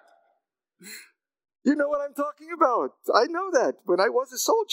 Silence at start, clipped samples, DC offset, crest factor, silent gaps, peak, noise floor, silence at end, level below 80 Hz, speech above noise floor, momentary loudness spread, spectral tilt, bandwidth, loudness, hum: 0.85 s; under 0.1%; under 0.1%; 22 dB; none; -4 dBFS; -75 dBFS; 0 s; -78 dBFS; 51 dB; 15 LU; -2.5 dB/octave; 16 kHz; -25 LUFS; none